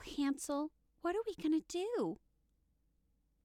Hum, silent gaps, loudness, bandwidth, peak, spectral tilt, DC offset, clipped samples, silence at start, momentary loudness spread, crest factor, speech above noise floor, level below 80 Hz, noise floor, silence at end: none; none; -39 LUFS; 15.5 kHz; -26 dBFS; -4.5 dB/octave; under 0.1%; under 0.1%; 0 s; 7 LU; 14 dB; 39 dB; -68 dBFS; -77 dBFS; 1.3 s